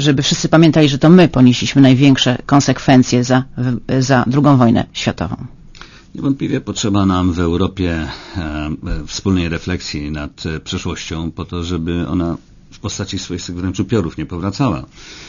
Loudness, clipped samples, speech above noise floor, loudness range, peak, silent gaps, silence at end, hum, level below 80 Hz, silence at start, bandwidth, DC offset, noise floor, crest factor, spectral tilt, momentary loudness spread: -15 LUFS; 0.2%; 24 dB; 11 LU; 0 dBFS; none; 0 s; none; -34 dBFS; 0 s; 7.4 kHz; under 0.1%; -38 dBFS; 14 dB; -6 dB/octave; 14 LU